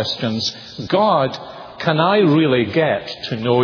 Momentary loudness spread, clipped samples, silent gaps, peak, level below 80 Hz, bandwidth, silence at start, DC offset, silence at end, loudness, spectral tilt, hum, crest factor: 11 LU; under 0.1%; none; 0 dBFS; -56 dBFS; 5.4 kHz; 0 s; under 0.1%; 0 s; -17 LUFS; -6 dB/octave; none; 16 dB